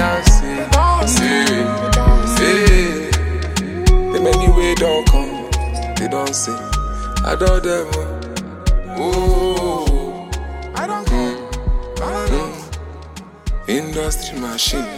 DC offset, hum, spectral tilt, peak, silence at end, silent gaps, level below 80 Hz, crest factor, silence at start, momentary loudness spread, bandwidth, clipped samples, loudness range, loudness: under 0.1%; none; -4.5 dB/octave; 0 dBFS; 0 s; none; -18 dBFS; 16 dB; 0 s; 13 LU; 16 kHz; under 0.1%; 8 LU; -18 LUFS